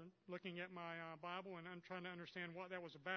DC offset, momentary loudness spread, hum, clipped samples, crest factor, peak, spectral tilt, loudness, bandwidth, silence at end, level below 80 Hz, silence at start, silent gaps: under 0.1%; 3 LU; none; under 0.1%; 20 dB; -30 dBFS; -3 dB/octave; -52 LUFS; 6.4 kHz; 0 s; under -90 dBFS; 0 s; none